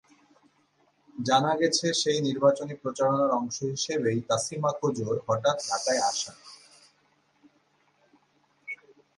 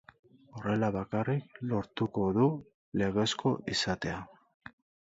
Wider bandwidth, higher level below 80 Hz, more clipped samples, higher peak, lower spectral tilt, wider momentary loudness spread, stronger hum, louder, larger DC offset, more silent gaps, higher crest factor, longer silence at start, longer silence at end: first, 11.5 kHz vs 8 kHz; second, -72 dBFS vs -58 dBFS; neither; first, -10 dBFS vs -16 dBFS; second, -4 dB/octave vs -5.5 dB/octave; first, 16 LU vs 13 LU; neither; first, -27 LUFS vs -32 LUFS; neither; second, none vs 2.74-2.92 s; about the same, 20 dB vs 16 dB; first, 1.15 s vs 0.55 s; second, 0.45 s vs 0.8 s